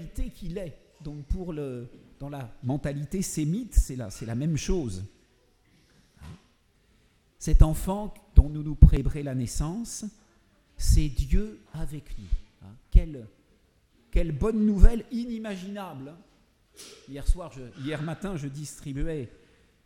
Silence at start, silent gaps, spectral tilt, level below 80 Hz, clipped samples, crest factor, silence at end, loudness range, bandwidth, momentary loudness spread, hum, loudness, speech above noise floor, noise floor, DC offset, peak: 0 s; none; -6.5 dB/octave; -28 dBFS; under 0.1%; 24 dB; 0.6 s; 10 LU; 15 kHz; 19 LU; none; -29 LUFS; 39 dB; -64 dBFS; under 0.1%; -2 dBFS